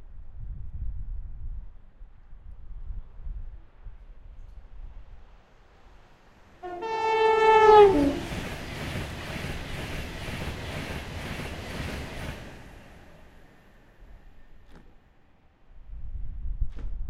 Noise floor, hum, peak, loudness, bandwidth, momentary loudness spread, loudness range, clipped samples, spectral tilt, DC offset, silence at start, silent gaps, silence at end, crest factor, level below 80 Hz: -58 dBFS; none; -4 dBFS; -25 LUFS; 13.5 kHz; 27 LU; 25 LU; under 0.1%; -5.5 dB/octave; under 0.1%; 0 s; none; 0 s; 24 dB; -40 dBFS